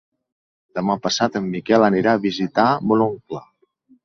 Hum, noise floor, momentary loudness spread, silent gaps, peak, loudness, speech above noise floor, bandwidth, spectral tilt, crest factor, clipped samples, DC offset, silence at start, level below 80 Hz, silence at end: none; -57 dBFS; 15 LU; none; -2 dBFS; -19 LUFS; 39 dB; 7.6 kHz; -5.5 dB/octave; 18 dB; under 0.1%; under 0.1%; 0.75 s; -60 dBFS; 0.65 s